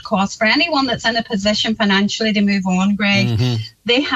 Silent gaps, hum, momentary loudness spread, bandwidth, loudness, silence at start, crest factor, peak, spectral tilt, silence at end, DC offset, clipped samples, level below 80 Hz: none; none; 4 LU; 8 kHz; -16 LUFS; 0.05 s; 14 dB; -4 dBFS; -5 dB/octave; 0 s; under 0.1%; under 0.1%; -48 dBFS